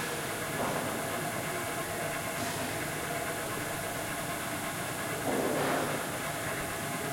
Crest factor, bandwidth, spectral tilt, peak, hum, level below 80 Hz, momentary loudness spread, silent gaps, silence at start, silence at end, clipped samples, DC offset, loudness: 16 dB; 16.5 kHz; -3.5 dB/octave; -18 dBFS; none; -58 dBFS; 4 LU; none; 0 s; 0 s; under 0.1%; under 0.1%; -33 LUFS